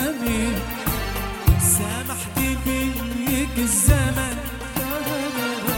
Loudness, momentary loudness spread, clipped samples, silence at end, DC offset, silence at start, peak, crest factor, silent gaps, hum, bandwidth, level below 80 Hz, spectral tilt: -22 LUFS; 9 LU; under 0.1%; 0 s; under 0.1%; 0 s; -4 dBFS; 18 dB; none; none; 18 kHz; -30 dBFS; -4 dB/octave